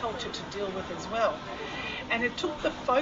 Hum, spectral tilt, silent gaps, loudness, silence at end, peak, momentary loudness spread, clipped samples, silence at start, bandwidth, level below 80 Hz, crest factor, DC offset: none; -4 dB/octave; none; -31 LUFS; 0 s; -14 dBFS; 7 LU; under 0.1%; 0 s; 8 kHz; -54 dBFS; 16 dB; under 0.1%